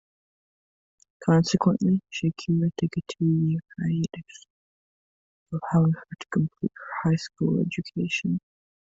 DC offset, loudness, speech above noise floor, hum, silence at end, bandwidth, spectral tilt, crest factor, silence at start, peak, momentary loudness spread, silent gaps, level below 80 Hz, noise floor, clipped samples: under 0.1%; -26 LUFS; over 65 dB; none; 0.45 s; 7.8 kHz; -7 dB/octave; 20 dB; 1.2 s; -8 dBFS; 10 LU; 4.50-5.46 s; -60 dBFS; under -90 dBFS; under 0.1%